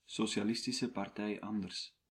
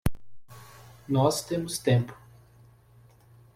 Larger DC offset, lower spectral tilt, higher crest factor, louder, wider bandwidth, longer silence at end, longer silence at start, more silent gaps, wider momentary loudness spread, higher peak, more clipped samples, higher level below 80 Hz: neither; second, -4 dB/octave vs -5.5 dB/octave; about the same, 16 dB vs 20 dB; second, -38 LUFS vs -27 LUFS; second, 13.5 kHz vs 16 kHz; second, 0.2 s vs 1.4 s; about the same, 0.1 s vs 0.05 s; neither; second, 6 LU vs 25 LU; second, -22 dBFS vs -10 dBFS; neither; second, -76 dBFS vs -48 dBFS